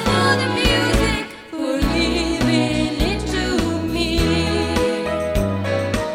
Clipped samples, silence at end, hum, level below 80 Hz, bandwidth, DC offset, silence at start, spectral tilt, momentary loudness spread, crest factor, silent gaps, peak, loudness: under 0.1%; 0 s; none; -28 dBFS; 16.5 kHz; under 0.1%; 0 s; -5 dB/octave; 5 LU; 14 dB; none; -4 dBFS; -19 LUFS